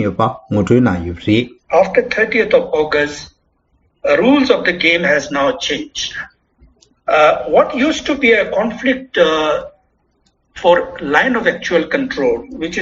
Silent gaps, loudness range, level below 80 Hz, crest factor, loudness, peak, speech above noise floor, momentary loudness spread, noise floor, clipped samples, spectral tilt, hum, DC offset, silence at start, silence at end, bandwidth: none; 2 LU; -46 dBFS; 16 dB; -14 LUFS; 0 dBFS; 46 dB; 10 LU; -60 dBFS; under 0.1%; -3 dB/octave; none; under 0.1%; 0 s; 0 s; 7.8 kHz